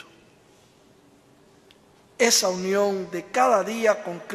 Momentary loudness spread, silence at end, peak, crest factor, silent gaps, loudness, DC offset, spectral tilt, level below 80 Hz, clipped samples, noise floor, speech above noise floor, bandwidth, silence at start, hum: 9 LU; 0 s; -4 dBFS; 22 dB; none; -22 LUFS; under 0.1%; -2.5 dB/octave; -70 dBFS; under 0.1%; -56 dBFS; 33 dB; 14.5 kHz; 2.2 s; none